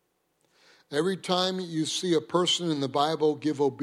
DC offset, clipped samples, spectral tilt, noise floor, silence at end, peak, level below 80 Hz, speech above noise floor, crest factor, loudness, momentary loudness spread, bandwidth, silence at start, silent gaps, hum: under 0.1%; under 0.1%; -4.5 dB/octave; -72 dBFS; 0 s; -10 dBFS; -76 dBFS; 46 dB; 18 dB; -27 LUFS; 4 LU; 15 kHz; 0.9 s; none; none